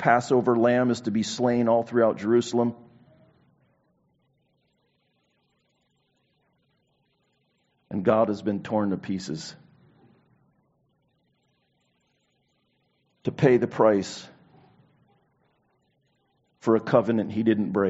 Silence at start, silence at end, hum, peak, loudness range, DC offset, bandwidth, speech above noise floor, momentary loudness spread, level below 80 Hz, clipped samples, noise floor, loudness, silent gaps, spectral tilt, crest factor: 0 s; 0 s; none; -4 dBFS; 11 LU; under 0.1%; 8 kHz; 48 dB; 13 LU; -66 dBFS; under 0.1%; -71 dBFS; -24 LUFS; none; -6 dB/octave; 22 dB